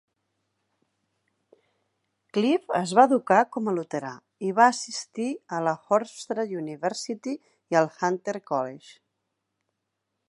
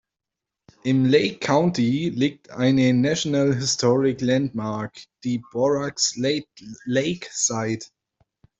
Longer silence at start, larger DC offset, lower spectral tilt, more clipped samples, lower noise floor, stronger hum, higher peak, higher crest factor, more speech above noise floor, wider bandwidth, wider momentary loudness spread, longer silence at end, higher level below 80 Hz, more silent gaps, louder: first, 2.35 s vs 0.85 s; neither; about the same, -4.5 dB/octave vs -4.5 dB/octave; neither; second, -81 dBFS vs -86 dBFS; neither; about the same, -4 dBFS vs -4 dBFS; first, 24 dB vs 18 dB; second, 56 dB vs 64 dB; first, 11.5 kHz vs 8.2 kHz; first, 13 LU vs 10 LU; first, 1.35 s vs 0.75 s; second, -82 dBFS vs -60 dBFS; neither; second, -26 LUFS vs -22 LUFS